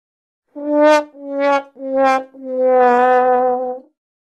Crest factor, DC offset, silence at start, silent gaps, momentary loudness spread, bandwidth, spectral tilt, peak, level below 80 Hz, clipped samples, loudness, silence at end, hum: 16 dB; under 0.1%; 0.55 s; none; 14 LU; 10 kHz; -3.5 dB/octave; 0 dBFS; -66 dBFS; under 0.1%; -15 LUFS; 0.45 s; none